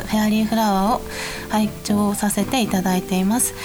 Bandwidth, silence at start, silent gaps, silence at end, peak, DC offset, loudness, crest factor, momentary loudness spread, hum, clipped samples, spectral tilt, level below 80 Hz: over 20 kHz; 0 s; none; 0 s; -6 dBFS; under 0.1%; -20 LUFS; 14 dB; 5 LU; none; under 0.1%; -4.5 dB/octave; -40 dBFS